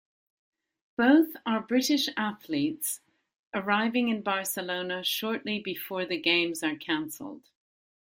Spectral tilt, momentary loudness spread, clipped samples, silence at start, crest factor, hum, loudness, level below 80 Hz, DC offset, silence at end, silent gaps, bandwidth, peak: -3 dB/octave; 10 LU; under 0.1%; 1 s; 20 dB; none; -28 LUFS; -74 dBFS; under 0.1%; 0.65 s; 3.39-3.52 s; 16.5 kHz; -10 dBFS